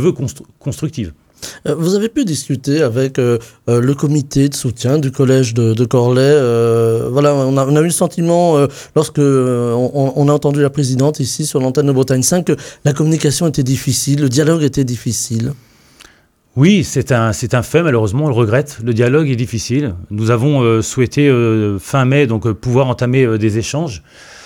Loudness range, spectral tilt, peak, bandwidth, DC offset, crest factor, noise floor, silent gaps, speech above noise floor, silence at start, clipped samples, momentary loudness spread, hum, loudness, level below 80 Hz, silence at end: 3 LU; -6 dB/octave; 0 dBFS; 17 kHz; under 0.1%; 14 dB; -48 dBFS; none; 34 dB; 0 s; under 0.1%; 8 LU; none; -14 LUFS; -44 dBFS; 0 s